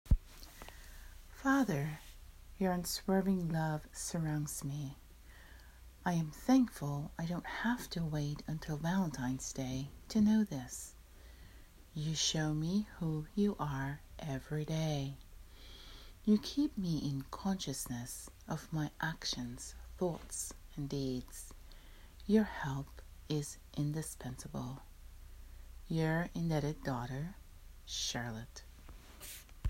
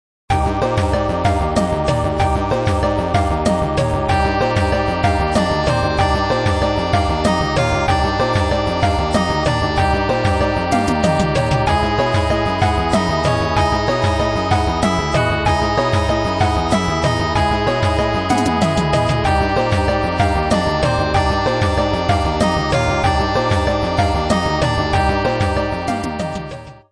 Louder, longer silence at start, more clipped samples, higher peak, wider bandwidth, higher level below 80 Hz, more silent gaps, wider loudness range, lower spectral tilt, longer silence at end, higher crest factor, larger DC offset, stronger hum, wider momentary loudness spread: second, -37 LUFS vs -17 LUFS; second, 0.05 s vs 0.3 s; neither; second, -18 dBFS vs -2 dBFS; first, 16 kHz vs 11 kHz; second, -50 dBFS vs -26 dBFS; neither; first, 4 LU vs 1 LU; about the same, -5 dB/octave vs -6 dB/octave; second, 0 s vs 0.15 s; about the same, 20 dB vs 16 dB; neither; neither; first, 24 LU vs 2 LU